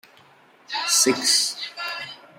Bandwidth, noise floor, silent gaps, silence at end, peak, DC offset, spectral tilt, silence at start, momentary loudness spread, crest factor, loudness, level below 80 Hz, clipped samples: 16 kHz; -54 dBFS; none; 0.2 s; -4 dBFS; under 0.1%; 0 dB/octave; 0.7 s; 13 LU; 20 dB; -20 LUFS; -78 dBFS; under 0.1%